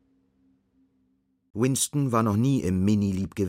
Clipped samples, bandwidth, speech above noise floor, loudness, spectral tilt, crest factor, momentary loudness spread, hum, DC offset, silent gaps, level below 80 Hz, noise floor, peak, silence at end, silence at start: under 0.1%; 16 kHz; 46 dB; -24 LUFS; -6 dB/octave; 16 dB; 5 LU; none; under 0.1%; none; -58 dBFS; -70 dBFS; -10 dBFS; 0 s; 1.55 s